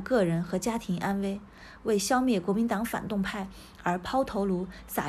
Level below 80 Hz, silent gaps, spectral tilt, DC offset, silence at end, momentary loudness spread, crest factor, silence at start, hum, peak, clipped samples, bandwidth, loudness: -52 dBFS; none; -5.5 dB/octave; under 0.1%; 0 s; 10 LU; 16 dB; 0 s; none; -14 dBFS; under 0.1%; 14.5 kHz; -29 LUFS